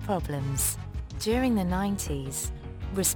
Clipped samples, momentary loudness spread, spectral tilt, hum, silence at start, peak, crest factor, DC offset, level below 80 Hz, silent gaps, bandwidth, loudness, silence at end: under 0.1%; 10 LU; -4.5 dB/octave; none; 0 s; -12 dBFS; 18 dB; under 0.1%; -38 dBFS; none; over 20 kHz; -29 LUFS; 0 s